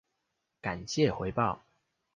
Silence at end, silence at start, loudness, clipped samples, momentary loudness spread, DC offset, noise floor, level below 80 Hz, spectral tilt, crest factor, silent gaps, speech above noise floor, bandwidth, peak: 0.6 s; 0.65 s; -32 LUFS; under 0.1%; 10 LU; under 0.1%; -82 dBFS; -56 dBFS; -5.5 dB/octave; 22 dB; none; 52 dB; 9.6 kHz; -12 dBFS